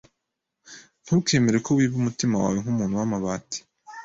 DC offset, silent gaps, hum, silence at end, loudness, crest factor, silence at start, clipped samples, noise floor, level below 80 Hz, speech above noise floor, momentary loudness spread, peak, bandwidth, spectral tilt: under 0.1%; none; none; 0 s; -24 LUFS; 16 dB; 0.7 s; under 0.1%; -82 dBFS; -56 dBFS; 59 dB; 14 LU; -8 dBFS; 7.8 kHz; -5.5 dB/octave